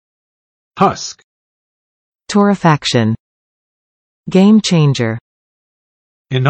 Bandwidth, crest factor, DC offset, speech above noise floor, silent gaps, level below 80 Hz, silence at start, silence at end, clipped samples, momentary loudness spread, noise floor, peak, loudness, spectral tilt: 8.8 kHz; 16 dB; under 0.1%; over 78 dB; 1.24-2.12 s, 3.20-4.24 s, 5.21-6.25 s; -54 dBFS; 0.75 s; 0 s; under 0.1%; 15 LU; under -90 dBFS; 0 dBFS; -13 LUFS; -6 dB/octave